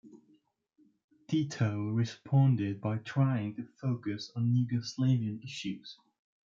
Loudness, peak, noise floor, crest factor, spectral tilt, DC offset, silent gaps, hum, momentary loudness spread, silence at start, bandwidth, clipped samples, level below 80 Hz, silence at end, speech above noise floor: -32 LUFS; -16 dBFS; -68 dBFS; 18 dB; -7 dB/octave; under 0.1%; 1.04-1.08 s; none; 11 LU; 0.05 s; 7.6 kHz; under 0.1%; -72 dBFS; 0.5 s; 38 dB